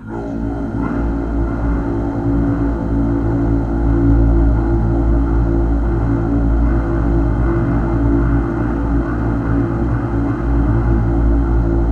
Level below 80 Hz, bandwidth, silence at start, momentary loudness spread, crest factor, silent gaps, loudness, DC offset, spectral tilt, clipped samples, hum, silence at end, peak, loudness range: -18 dBFS; 3.3 kHz; 0 s; 4 LU; 12 dB; none; -17 LUFS; under 0.1%; -10.5 dB/octave; under 0.1%; none; 0 s; -2 dBFS; 2 LU